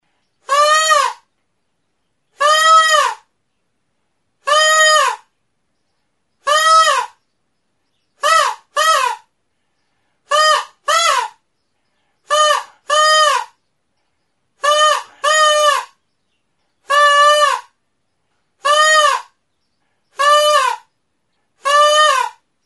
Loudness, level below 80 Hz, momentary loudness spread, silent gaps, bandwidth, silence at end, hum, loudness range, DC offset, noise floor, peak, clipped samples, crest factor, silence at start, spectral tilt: -13 LUFS; -76 dBFS; 12 LU; none; 12 kHz; 0.35 s; none; 3 LU; under 0.1%; -71 dBFS; 0 dBFS; under 0.1%; 16 dB; 0.5 s; 4.5 dB/octave